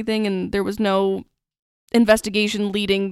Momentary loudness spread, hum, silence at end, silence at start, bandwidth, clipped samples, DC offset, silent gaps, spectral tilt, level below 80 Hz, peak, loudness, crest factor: 7 LU; none; 0 s; 0 s; 14 kHz; under 0.1%; under 0.1%; 1.59-1.88 s; -5 dB/octave; -48 dBFS; -2 dBFS; -20 LUFS; 18 dB